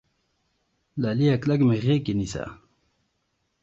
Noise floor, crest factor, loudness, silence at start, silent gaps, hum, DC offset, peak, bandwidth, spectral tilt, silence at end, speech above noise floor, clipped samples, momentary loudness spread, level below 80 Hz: -74 dBFS; 16 dB; -24 LUFS; 0.95 s; none; none; under 0.1%; -10 dBFS; 7.8 kHz; -7.5 dB/octave; 1.1 s; 51 dB; under 0.1%; 14 LU; -52 dBFS